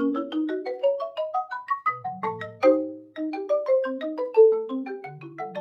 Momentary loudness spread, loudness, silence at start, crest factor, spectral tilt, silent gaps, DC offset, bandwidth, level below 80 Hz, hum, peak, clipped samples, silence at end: 15 LU; -25 LUFS; 0 s; 18 dB; -7 dB/octave; none; under 0.1%; 6.2 kHz; -84 dBFS; none; -6 dBFS; under 0.1%; 0 s